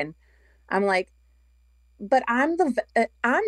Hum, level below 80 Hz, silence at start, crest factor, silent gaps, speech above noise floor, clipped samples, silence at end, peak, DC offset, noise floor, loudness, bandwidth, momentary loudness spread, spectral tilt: none; -60 dBFS; 0 s; 18 dB; none; 36 dB; under 0.1%; 0 s; -8 dBFS; under 0.1%; -59 dBFS; -24 LUFS; 12 kHz; 12 LU; -5.5 dB/octave